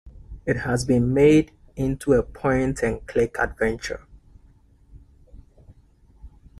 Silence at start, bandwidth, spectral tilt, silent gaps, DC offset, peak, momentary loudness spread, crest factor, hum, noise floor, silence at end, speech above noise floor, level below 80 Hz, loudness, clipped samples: 0.05 s; 14 kHz; -6.5 dB/octave; none; under 0.1%; -6 dBFS; 15 LU; 18 dB; none; -55 dBFS; 0.3 s; 33 dB; -42 dBFS; -22 LUFS; under 0.1%